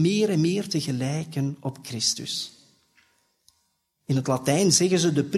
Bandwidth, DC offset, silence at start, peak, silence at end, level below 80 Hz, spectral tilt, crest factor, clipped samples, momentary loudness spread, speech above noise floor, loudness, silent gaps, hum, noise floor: 14.5 kHz; under 0.1%; 0 s; -6 dBFS; 0 s; -66 dBFS; -4.5 dB/octave; 18 dB; under 0.1%; 13 LU; 49 dB; -24 LUFS; none; none; -72 dBFS